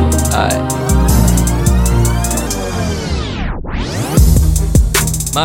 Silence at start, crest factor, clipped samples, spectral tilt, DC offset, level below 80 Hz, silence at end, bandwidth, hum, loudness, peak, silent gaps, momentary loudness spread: 0 s; 12 dB; under 0.1%; -5 dB/octave; under 0.1%; -16 dBFS; 0 s; 17 kHz; none; -14 LUFS; 0 dBFS; none; 8 LU